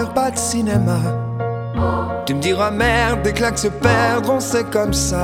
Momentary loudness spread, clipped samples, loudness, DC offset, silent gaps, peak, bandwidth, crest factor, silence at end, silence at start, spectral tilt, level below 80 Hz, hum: 6 LU; under 0.1%; -18 LUFS; under 0.1%; none; 0 dBFS; 17 kHz; 16 dB; 0 s; 0 s; -4.5 dB/octave; -32 dBFS; none